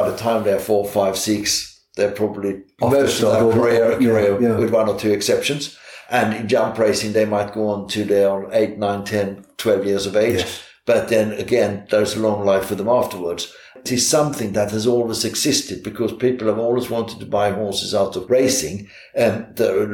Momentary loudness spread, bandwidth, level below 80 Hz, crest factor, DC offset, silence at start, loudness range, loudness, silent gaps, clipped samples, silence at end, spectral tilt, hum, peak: 9 LU; 19 kHz; -54 dBFS; 14 dB; under 0.1%; 0 s; 3 LU; -19 LUFS; none; under 0.1%; 0 s; -4 dB/octave; none; -4 dBFS